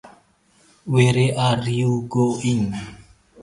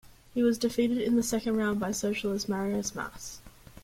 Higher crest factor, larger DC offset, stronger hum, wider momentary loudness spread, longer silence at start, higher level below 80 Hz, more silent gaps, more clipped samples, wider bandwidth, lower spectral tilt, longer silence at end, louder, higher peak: about the same, 18 dB vs 16 dB; neither; neither; about the same, 14 LU vs 12 LU; about the same, 0.05 s vs 0.05 s; about the same, -52 dBFS vs -56 dBFS; neither; neither; second, 11.5 kHz vs 16.5 kHz; first, -6.5 dB/octave vs -4.5 dB/octave; about the same, 0 s vs 0.05 s; first, -20 LUFS vs -29 LUFS; first, -2 dBFS vs -14 dBFS